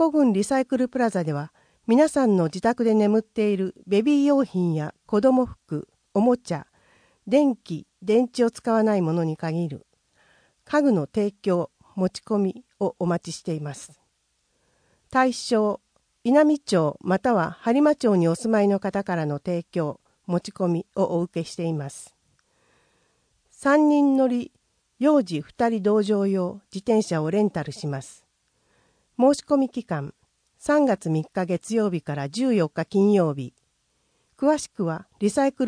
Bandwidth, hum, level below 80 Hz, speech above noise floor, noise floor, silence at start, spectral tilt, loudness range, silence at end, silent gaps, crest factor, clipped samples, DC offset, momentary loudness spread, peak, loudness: 10.5 kHz; none; -62 dBFS; 49 dB; -71 dBFS; 0 s; -6.5 dB/octave; 6 LU; 0 s; none; 16 dB; under 0.1%; under 0.1%; 12 LU; -6 dBFS; -23 LUFS